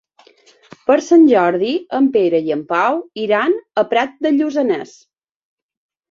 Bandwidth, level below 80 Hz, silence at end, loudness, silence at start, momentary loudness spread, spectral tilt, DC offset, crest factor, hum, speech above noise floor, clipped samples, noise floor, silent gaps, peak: 7.4 kHz; -66 dBFS; 1.25 s; -16 LUFS; 0.9 s; 9 LU; -5.5 dB/octave; under 0.1%; 16 dB; none; 35 dB; under 0.1%; -50 dBFS; none; -2 dBFS